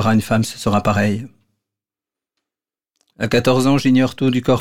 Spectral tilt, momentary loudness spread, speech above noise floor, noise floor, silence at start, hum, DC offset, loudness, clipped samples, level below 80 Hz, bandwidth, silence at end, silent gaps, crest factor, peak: -6 dB/octave; 6 LU; 73 dB; -89 dBFS; 0 s; none; under 0.1%; -17 LUFS; under 0.1%; -48 dBFS; 16.5 kHz; 0 s; none; 14 dB; -4 dBFS